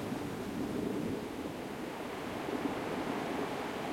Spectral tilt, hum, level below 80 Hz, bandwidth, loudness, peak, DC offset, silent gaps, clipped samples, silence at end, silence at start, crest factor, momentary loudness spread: -5.5 dB/octave; none; -62 dBFS; 16.5 kHz; -38 LUFS; -22 dBFS; under 0.1%; none; under 0.1%; 0 s; 0 s; 14 dB; 4 LU